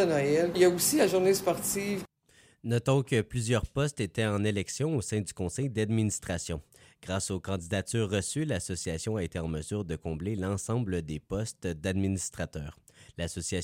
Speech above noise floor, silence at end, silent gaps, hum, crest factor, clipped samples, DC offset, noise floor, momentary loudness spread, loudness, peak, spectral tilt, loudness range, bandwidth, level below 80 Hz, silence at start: 33 dB; 0 s; none; none; 18 dB; under 0.1%; under 0.1%; -62 dBFS; 12 LU; -30 LUFS; -12 dBFS; -5 dB/octave; 6 LU; 16 kHz; -52 dBFS; 0 s